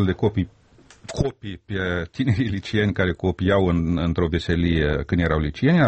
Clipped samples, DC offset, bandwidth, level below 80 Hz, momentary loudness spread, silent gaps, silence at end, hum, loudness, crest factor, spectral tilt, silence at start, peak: under 0.1%; under 0.1%; 8.4 kHz; -36 dBFS; 8 LU; none; 0 s; none; -23 LUFS; 14 dB; -7.5 dB/octave; 0 s; -6 dBFS